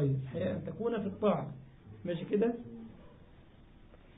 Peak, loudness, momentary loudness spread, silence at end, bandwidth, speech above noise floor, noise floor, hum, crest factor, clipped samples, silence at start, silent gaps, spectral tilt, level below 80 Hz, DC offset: -18 dBFS; -35 LUFS; 19 LU; 0.05 s; 3.9 kHz; 23 dB; -57 dBFS; none; 18 dB; under 0.1%; 0 s; none; -7 dB/octave; -60 dBFS; under 0.1%